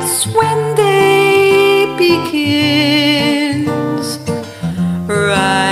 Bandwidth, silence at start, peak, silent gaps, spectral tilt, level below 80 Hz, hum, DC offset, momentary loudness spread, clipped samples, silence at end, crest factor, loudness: 16 kHz; 0 s; 0 dBFS; none; -4 dB/octave; -48 dBFS; none; under 0.1%; 9 LU; under 0.1%; 0 s; 12 dB; -12 LUFS